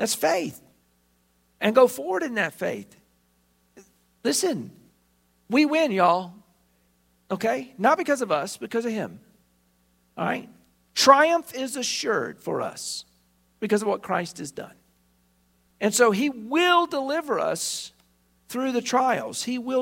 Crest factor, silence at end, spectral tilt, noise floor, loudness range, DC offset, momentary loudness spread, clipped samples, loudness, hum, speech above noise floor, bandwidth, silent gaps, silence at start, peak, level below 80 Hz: 24 dB; 0 s; -3 dB/octave; -66 dBFS; 6 LU; under 0.1%; 15 LU; under 0.1%; -24 LUFS; 60 Hz at -60 dBFS; 42 dB; 16.5 kHz; none; 0 s; 0 dBFS; -70 dBFS